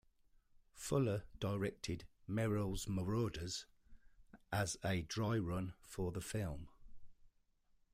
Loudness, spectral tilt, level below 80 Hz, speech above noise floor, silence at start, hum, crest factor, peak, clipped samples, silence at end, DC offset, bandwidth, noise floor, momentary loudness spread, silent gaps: -41 LUFS; -5.5 dB/octave; -58 dBFS; 35 dB; 0.75 s; none; 16 dB; -26 dBFS; under 0.1%; 0.65 s; under 0.1%; 16 kHz; -75 dBFS; 9 LU; none